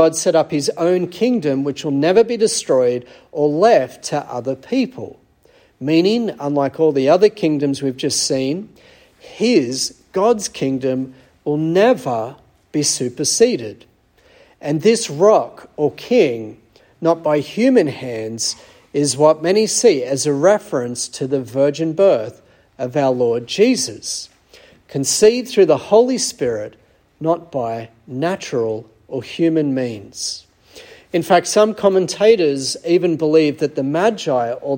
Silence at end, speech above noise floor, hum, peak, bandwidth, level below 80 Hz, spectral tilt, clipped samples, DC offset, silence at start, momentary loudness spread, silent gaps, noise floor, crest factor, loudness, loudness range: 0 s; 36 dB; none; 0 dBFS; 17 kHz; -60 dBFS; -4.5 dB/octave; under 0.1%; under 0.1%; 0 s; 12 LU; none; -53 dBFS; 16 dB; -17 LUFS; 4 LU